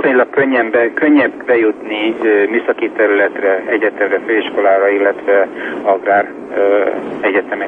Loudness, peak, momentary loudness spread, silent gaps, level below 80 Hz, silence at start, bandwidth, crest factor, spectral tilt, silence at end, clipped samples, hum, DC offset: -14 LUFS; -2 dBFS; 6 LU; none; -62 dBFS; 0 s; 4.3 kHz; 12 dB; -7 dB/octave; 0 s; under 0.1%; none; under 0.1%